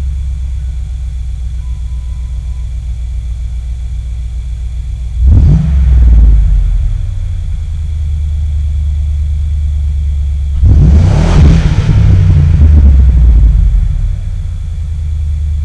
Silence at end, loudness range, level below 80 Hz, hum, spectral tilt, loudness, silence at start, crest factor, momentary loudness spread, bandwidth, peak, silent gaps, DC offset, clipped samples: 0 s; 12 LU; -10 dBFS; none; -8.5 dB/octave; -12 LUFS; 0 s; 8 dB; 13 LU; 7.8 kHz; 0 dBFS; none; under 0.1%; 2%